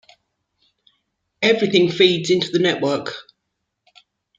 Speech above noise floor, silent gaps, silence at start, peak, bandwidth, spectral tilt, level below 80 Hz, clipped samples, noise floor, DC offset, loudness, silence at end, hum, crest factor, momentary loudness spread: 59 dB; none; 1.4 s; -2 dBFS; 7.8 kHz; -5 dB/octave; -66 dBFS; under 0.1%; -77 dBFS; under 0.1%; -18 LUFS; 1.15 s; none; 20 dB; 10 LU